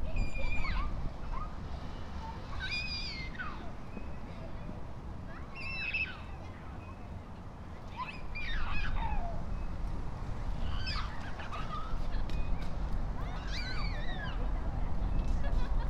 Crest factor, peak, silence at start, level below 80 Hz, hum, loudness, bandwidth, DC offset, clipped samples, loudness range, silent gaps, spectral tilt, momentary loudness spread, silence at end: 16 dB; -18 dBFS; 0 s; -36 dBFS; none; -40 LUFS; 7.6 kHz; under 0.1%; under 0.1%; 2 LU; none; -5.5 dB/octave; 10 LU; 0 s